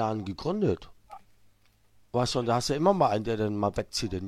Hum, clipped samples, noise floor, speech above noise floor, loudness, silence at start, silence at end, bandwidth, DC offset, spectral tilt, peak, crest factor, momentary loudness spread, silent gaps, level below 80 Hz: none; under 0.1%; -62 dBFS; 34 dB; -28 LUFS; 0 s; 0 s; 14 kHz; under 0.1%; -5.5 dB/octave; -10 dBFS; 18 dB; 8 LU; none; -52 dBFS